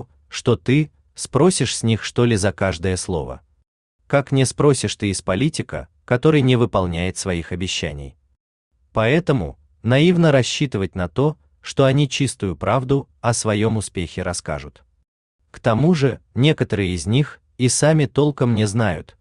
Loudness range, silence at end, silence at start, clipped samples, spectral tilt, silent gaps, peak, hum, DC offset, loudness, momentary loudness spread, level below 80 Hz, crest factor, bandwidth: 3 LU; 0.2 s; 0 s; under 0.1%; -5.5 dB/octave; 3.67-3.99 s, 8.40-8.71 s, 15.08-15.39 s; -4 dBFS; none; under 0.1%; -19 LUFS; 11 LU; -46 dBFS; 16 dB; 12.5 kHz